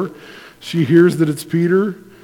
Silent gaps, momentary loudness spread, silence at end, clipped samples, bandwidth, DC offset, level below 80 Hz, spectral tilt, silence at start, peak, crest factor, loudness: none; 13 LU; 0.3 s; under 0.1%; 16.5 kHz; under 0.1%; -60 dBFS; -7 dB/octave; 0 s; 0 dBFS; 16 dB; -16 LUFS